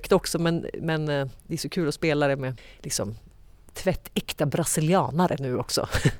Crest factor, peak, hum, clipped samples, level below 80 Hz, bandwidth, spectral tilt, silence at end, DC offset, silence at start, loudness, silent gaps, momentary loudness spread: 18 dB; -8 dBFS; none; under 0.1%; -44 dBFS; 19.5 kHz; -5 dB/octave; 0 s; under 0.1%; 0 s; -26 LUFS; none; 10 LU